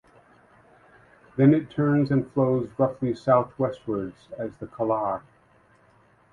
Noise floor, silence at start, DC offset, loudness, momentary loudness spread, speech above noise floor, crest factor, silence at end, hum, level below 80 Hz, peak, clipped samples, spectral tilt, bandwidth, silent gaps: -59 dBFS; 1.35 s; under 0.1%; -25 LUFS; 15 LU; 35 dB; 20 dB; 1.15 s; none; -60 dBFS; -6 dBFS; under 0.1%; -10 dB/octave; 7.2 kHz; none